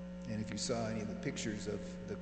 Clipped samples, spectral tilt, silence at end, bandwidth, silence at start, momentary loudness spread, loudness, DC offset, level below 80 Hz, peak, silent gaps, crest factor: under 0.1%; -5 dB/octave; 0 s; 9 kHz; 0 s; 6 LU; -40 LUFS; under 0.1%; -58 dBFS; -22 dBFS; none; 18 dB